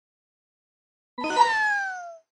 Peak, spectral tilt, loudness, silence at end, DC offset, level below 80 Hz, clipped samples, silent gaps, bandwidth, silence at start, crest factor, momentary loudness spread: -6 dBFS; -1 dB/octave; -23 LUFS; 0.2 s; under 0.1%; -70 dBFS; under 0.1%; none; 10.5 kHz; 1.2 s; 22 dB; 17 LU